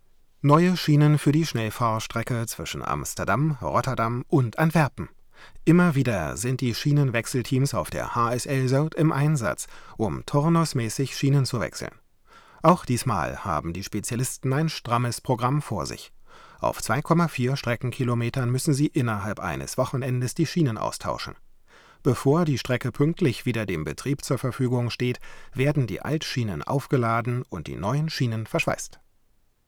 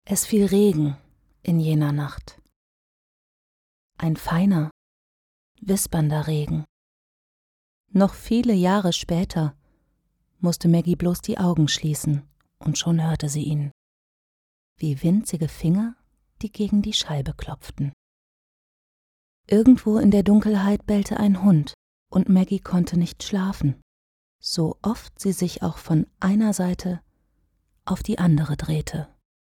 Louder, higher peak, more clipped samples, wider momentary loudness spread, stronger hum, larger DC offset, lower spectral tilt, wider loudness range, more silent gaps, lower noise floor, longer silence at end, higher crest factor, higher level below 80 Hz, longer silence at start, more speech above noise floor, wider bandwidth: second, -25 LUFS vs -22 LUFS; second, -8 dBFS vs -4 dBFS; neither; second, 9 LU vs 13 LU; neither; neither; about the same, -6 dB/octave vs -6 dB/octave; second, 3 LU vs 7 LU; second, none vs 2.56-3.90 s, 4.71-5.55 s, 6.69-7.84 s, 13.71-14.76 s, 17.93-19.44 s, 21.74-22.06 s, 23.82-24.39 s; second, -63 dBFS vs -70 dBFS; first, 0.8 s vs 0.4 s; about the same, 18 dB vs 18 dB; about the same, -50 dBFS vs -46 dBFS; first, 0.4 s vs 0.1 s; second, 38 dB vs 49 dB; about the same, 18 kHz vs 18 kHz